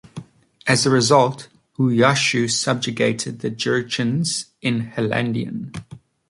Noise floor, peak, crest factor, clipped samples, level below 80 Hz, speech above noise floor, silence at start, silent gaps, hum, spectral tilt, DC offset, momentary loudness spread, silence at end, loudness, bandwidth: -39 dBFS; -2 dBFS; 18 dB; under 0.1%; -58 dBFS; 20 dB; 0.15 s; none; none; -4.5 dB/octave; under 0.1%; 17 LU; 0.45 s; -20 LUFS; 11.5 kHz